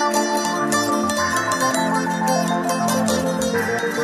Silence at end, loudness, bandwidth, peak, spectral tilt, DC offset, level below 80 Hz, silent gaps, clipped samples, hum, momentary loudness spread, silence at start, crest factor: 0 s; -20 LUFS; 15.5 kHz; -4 dBFS; -3.5 dB/octave; under 0.1%; -52 dBFS; none; under 0.1%; none; 2 LU; 0 s; 16 dB